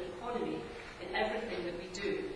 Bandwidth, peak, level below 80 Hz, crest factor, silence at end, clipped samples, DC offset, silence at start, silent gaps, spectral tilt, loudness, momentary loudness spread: 11 kHz; -20 dBFS; -58 dBFS; 18 dB; 0 s; under 0.1%; under 0.1%; 0 s; none; -4.5 dB/octave; -38 LUFS; 8 LU